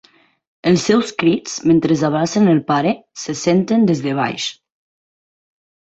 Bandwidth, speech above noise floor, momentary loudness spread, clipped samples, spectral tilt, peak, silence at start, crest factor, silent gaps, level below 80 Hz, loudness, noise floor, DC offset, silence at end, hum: 8.2 kHz; over 74 dB; 8 LU; under 0.1%; -5.5 dB/octave; -2 dBFS; 0.65 s; 14 dB; none; -56 dBFS; -17 LUFS; under -90 dBFS; under 0.1%; 1.35 s; none